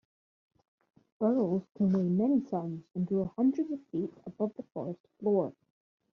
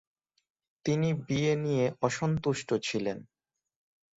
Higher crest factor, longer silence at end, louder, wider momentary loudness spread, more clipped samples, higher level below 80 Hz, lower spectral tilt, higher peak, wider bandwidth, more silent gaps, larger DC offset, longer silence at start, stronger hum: about the same, 16 dB vs 20 dB; second, 0.6 s vs 0.95 s; about the same, -32 LUFS vs -30 LUFS; first, 12 LU vs 7 LU; neither; second, -70 dBFS vs -62 dBFS; first, -11.5 dB/octave vs -6 dB/octave; second, -16 dBFS vs -12 dBFS; second, 6.2 kHz vs 8 kHz; first, 5.00-5.04 s vs none; neither; first, 1.2 s vs 0.85 s; neither